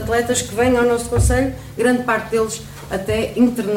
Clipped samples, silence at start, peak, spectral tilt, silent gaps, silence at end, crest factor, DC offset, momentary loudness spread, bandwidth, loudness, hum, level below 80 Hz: under 0.1%; 0 s; -4 dBFS; -5 dB/octave; none; 0 s; 14 dB; 0.1%; 8 LU; 16.5 kHz; -18 LUFS; none; -30 dBFS